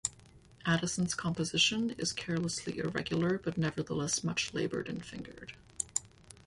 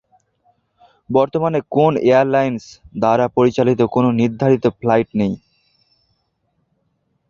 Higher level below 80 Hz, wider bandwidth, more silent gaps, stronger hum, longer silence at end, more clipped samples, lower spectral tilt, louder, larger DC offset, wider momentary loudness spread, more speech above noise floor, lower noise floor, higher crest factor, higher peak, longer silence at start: second, -60 dBFS vs -52 dBFS; first, 11.5 kHz vs 7.4 kHz; neither; neither; second, 0.1 s vs 1.9 s; neither; second, -3.5 dB/octave vs -8 dB/octave; second, -33 LUFS vs -16 LUFS; neither; first, 13 LU vs 8 LU; second, 25 dB vs 52 dB; second, -58 dBFS vs -67 dBFS; first, 22 dB vs 16 dB; second, -12 dBFS vs -2 dBFS; second, 0.05 s vs 1.1 s